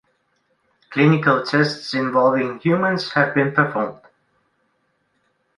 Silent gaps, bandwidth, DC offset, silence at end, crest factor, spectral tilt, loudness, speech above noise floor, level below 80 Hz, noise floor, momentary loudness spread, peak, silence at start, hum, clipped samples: none; 11 kHz; under 0.1%; 1.65 s; 18 dB; -7 dB/octave; -19 LUFS; 49 dB; -64 dBFS; -68 dBFS; 7 LU; -2 dBFS; 0.9 s; none; under 0.1%